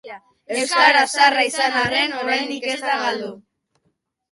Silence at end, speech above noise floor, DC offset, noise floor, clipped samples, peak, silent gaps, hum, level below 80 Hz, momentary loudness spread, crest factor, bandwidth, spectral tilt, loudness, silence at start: 0.9 s; 51 dB; under 0.1%; -70 dBFS; under 0.1%; -2 dBFS; none; none; -62 dBFS; 11 LU; 18 dB; 11.5 kHz; -1.5 dB/octave; -18 LUFS; 0.05 s